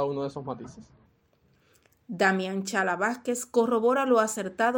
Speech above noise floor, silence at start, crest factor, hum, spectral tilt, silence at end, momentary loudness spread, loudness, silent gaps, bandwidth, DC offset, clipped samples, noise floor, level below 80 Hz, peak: 39 dB; 0 s; 20 dB; none; -4.5 dB/octave; 0 s; 14 LU; -26 LUFS; none; 17 kHz; under 0.1%; under 0.1%; -66 dBFS; -70 dBFS; -8 dBFS